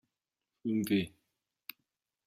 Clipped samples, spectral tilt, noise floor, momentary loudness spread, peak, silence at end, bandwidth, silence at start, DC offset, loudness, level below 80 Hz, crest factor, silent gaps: under 0.1%; -6 dB/octave; -89 dBFS; 19 LU; -20 dBFS; 1.2 s; 16 kHz; 0.65 s; under 0.1%; -34 LUFS; -72 dBFS; 18 dB; none